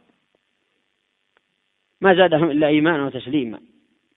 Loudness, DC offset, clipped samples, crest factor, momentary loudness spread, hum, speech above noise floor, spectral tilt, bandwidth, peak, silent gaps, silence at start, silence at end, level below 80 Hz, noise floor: -18 LUFS; under 0.1%; under 0.1%; 22 dB; 11 LU; none; 53 dB; -10 dB/octave; 4 kHz; 0 dBFS; none; 2 s; 0.6 s; -62 dBFS; -71 dBFS